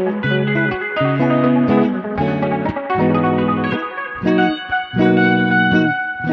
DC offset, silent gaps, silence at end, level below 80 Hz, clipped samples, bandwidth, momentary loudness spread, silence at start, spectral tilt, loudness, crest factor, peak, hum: under 0.1%; none; 0 s; -46 dBFS; under 0.1%; 6.2 kHz; 7 LU; 0 s; -8.5 dB/octave; -17 LUFS; 14 dB; -2 dBFS; none